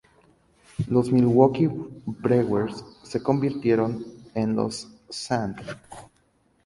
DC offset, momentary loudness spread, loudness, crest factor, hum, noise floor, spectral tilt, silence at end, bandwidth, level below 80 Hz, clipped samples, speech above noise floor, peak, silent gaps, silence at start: under 0.1%; 19 LU; -24 LUFS; 22 dB; none; -65 dBFS; -7 dB/octave; 0.65 s; 11.5 kHz; -56 dBFS; under 0.1%; 42 dB; -2 dBFS; none; 0.8 s